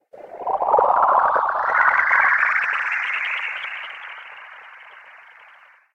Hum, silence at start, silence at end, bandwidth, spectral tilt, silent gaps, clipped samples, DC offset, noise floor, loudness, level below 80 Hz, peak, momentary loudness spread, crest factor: none; 0.15 s; 0.75 s; 8.6 kHz; -2.5 dB/octave; none; under 0.1%; under 0.1%; -50 dBFS; -18 LUFS; -64 dBFS; -2 dBFS; 21 LU; 18 dB